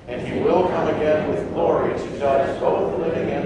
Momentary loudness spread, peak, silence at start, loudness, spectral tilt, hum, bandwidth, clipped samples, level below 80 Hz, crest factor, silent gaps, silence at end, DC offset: 5 LU; -4 dBFS; 0 s; -21 LUFS; -7.5 dB/octave; none; 10.5 kHz; under 0.1%; -46 dBFS; 16 dB; none; 0 s; under 0.1%